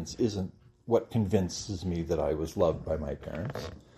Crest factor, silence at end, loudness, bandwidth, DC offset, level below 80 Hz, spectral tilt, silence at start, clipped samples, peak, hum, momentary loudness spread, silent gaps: 20 dB; 0.15 s; -31 LUFS; 14 kHz; under 0.1%; -50 dBFS; -6.5 dB/octave; 0 s; under 0.1%; -12 dBFS; none; 9 LU; none